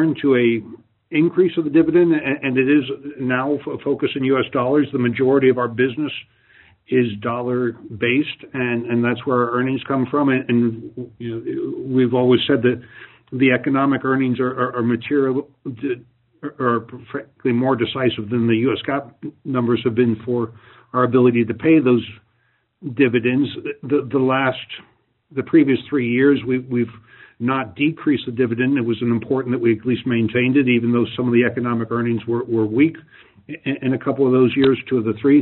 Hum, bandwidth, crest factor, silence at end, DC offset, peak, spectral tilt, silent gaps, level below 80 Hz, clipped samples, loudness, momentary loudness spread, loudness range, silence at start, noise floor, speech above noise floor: none; 4.2 kHz; 16 dB; 0 s; under 0.1%; -4 dBFS; -5.5 dB/octave; none; -60 dBFS; under 0.1%; -19 LUFS; 11 LU; 3 LU; 0 s; -65 dBFS; 46 dB